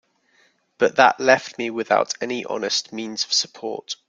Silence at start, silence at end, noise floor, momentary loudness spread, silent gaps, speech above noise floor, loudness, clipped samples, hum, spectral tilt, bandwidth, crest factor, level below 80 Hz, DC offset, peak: 0.8 s; 0.15 s; -61 dBFS; 12 LU; none; 40 dB; -21 LUFS; under 0.1%; none; -2 dB/octave; 9.4 kHz; 22 dB; -70 dBFS; under 0.1%; -2 dBFS